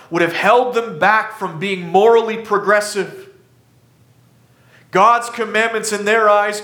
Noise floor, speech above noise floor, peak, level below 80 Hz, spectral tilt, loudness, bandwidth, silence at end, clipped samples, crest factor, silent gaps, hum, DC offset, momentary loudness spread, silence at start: -52 dBFS; 37 dB; -2 dBFS; -68 dBFS; -4 dB/octave; -15 LUFS; 18.5 kHz; 0 s; under 0.1%; 16 dB; none; none; under 0.1%; 10 LU; 0.1 s